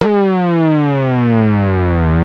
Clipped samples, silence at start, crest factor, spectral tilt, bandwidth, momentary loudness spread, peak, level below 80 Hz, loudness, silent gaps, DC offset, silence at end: under 0.1%; 0 s; 12 dB; -10 dB/octave; 6 kHz; 2 LU; 0 dBFS; -28 dBFS; -13 LUFS; none; under 0.1%; 0 s